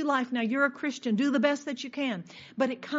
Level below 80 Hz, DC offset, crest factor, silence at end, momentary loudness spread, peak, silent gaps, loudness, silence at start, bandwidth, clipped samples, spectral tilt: -80 dBFS; under 0.1%; 16 dB; 0 s; 8 LU; -12 dBFS; none; -29 LUFS; 0 s; 7.6 kHz; under 0.1%; -3.5 dB/octave